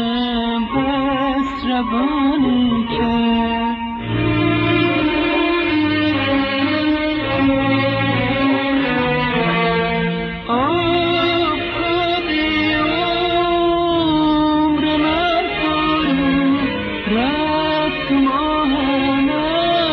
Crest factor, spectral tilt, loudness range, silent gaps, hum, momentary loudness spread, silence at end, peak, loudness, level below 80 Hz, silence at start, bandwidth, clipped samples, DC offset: 12 dB; -3.5 dB/octave; 1 LU; none; none; 3 LU; 0 s; -4 dBFS; -17 LUFS; -38 dBFS; 0 s; 5.8 kHz; under 0.1%; under 0.1%